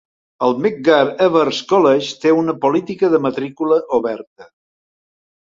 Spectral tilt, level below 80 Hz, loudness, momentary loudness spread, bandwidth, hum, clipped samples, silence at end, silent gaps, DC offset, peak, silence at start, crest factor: -5.5 dB/octave; -62 dBFS; -16 LUFS; 7 LU; 7.6 kHz; none; under 0.1%; 1 s; 4.27-4.36 s; under 0.1%; -2 dBFS; 0.4 s; 16 dB